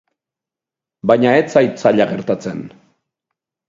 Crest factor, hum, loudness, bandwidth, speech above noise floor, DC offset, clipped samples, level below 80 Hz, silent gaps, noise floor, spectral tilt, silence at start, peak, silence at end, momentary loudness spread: 18 dB; none; -15 LUFS; 7.8 kHz; 72 dB; under 0.1%; under 0.1%; -60 dBFS; none; -87 dBFS; -6.5 dB/octave; 1.05 s; 0 dBFS; 1 s; 12 LU